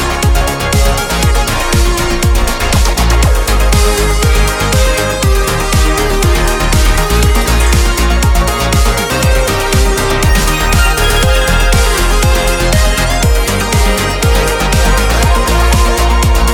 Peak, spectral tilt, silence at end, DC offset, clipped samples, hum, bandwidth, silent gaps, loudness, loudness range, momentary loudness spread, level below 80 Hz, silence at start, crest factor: 0 dBFS; -4 dB/octave; 0 s; under 0.1%; under 0.1%; none; 18.5 kHz; none; -11 LUFS; 1 LU; 2 LU; -12 dBFS; 0 s; 10 dB